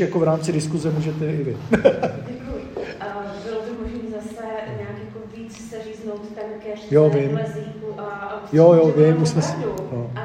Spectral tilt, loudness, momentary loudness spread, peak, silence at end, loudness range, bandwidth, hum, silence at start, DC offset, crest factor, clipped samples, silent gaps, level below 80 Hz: -7 dB/octave; -21 LUFS; 17 LU; -2 dBFS; 0 s; 13 LU; 9.8 kHz; none; 0 s; under 0.1%; 20 dB; under 0.1%; none; -48 dBFS